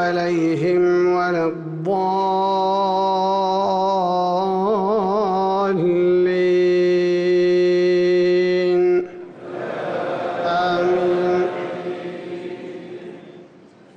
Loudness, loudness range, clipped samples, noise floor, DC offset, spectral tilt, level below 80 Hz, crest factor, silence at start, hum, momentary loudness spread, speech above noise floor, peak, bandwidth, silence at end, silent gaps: -19 LUFS; 5 LU; under 0.1%; -47 dBFS; under 0.1%; -7 dB/octave; -60 dBFS; 8 dB; 0 s; none; 14 LU; 28 dB; -10 dBFS; 6.8 kHz; 0.5 s; none